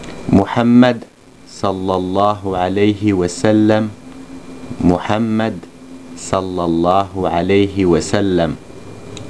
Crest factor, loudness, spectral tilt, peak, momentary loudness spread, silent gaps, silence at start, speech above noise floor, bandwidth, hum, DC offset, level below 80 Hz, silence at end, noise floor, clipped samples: 16 dB; -15 LUFS; -6.5 dB/octave; 0 dBFS; 22 LU; none; 0 s; 24 dB; 11 kHz; none; 0.6%; -42 dBFS; 0 s; -39 dBFS; under 0.1%